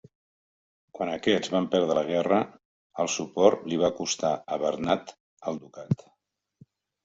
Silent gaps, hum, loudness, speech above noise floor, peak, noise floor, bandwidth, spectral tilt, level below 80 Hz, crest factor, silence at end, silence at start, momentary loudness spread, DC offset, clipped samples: 2.65-2.90 s, 5.20-5.37 s; none; -27 LUFS; 37 dB; -4 dBFS; -63 dBFS; 8 kHz; -4.5 dB/octave; -66 dBFS; 24 dB; 1.1 s; 0.95 s; 13 LU; under 0.1%; under 0.1%